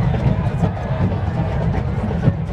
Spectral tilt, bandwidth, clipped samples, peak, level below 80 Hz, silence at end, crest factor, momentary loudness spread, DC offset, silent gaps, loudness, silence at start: -9 dB/octave; 8.4 kHz; under 0.1%; -2 dBFS; -28 dBFS; 0 s; 16 dB; 3 LU; under 0.1%; none; -20 LUFS; 0 s